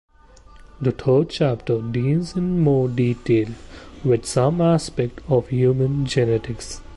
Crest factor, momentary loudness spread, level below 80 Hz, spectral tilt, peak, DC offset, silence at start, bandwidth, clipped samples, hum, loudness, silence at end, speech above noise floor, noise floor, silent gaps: 14 dB; 8 LU; -44 dBFS; -7 dB/octave; -6 dBFS; under 0.1%; 0.6 s; 11.5 kHz; under 0.1%; none; -21 LUFS; 0 s; 27 dB; -47 dBFS; none